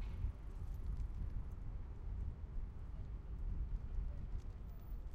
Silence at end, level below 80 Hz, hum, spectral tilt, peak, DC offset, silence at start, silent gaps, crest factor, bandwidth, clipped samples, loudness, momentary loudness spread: 0 s; -44 dBFS; none; -8.5 dB/octave; -30 dBFS; under 0.1%; 0 s; none; 14 dB; 15.5 kHz; under 0.1%; -49 LUFS; 5 LU